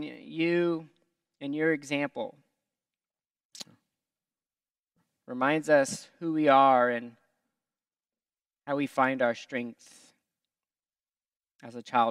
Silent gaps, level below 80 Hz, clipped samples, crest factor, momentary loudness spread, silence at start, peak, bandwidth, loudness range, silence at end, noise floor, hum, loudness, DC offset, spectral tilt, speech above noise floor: 3.45-3.50 s, 11.00-11.04 s, 11.55-11.59 s; -84 dBFS; under 0.1%; 22 dB; 23 LU; 0 s; -8 dBFS; 13.5 kHz; 10 LU; 0 s; under -90 dBFS; none; -27 LUFS; under 0.1%; -5 dB/octave; over 63 dB